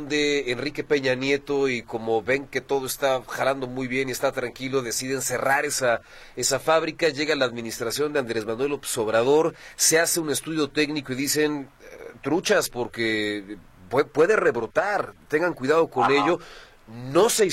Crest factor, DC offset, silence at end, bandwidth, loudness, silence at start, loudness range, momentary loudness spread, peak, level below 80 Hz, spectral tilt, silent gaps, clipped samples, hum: 18 dB; under 0.1%; 0 s; 16.5 kHz; -24 LUFS; 0 s; 3 LU; 9 LU; -6 dBFS; -54 dBFS; -3 dB/octave; none; under 0.1%; none